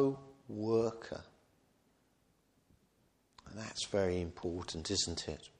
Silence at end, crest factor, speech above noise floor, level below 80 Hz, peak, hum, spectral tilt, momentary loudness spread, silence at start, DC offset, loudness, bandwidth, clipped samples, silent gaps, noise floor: 0.1 s; 20 dB; 36 dB; -62 dBFS; -18 dBFS; none; -4.5 dB/octave; 14 LU; 0 s; under 0.1%; -37 LUFS; 10.5 kHz; under 0.1%; none; -74 dBFS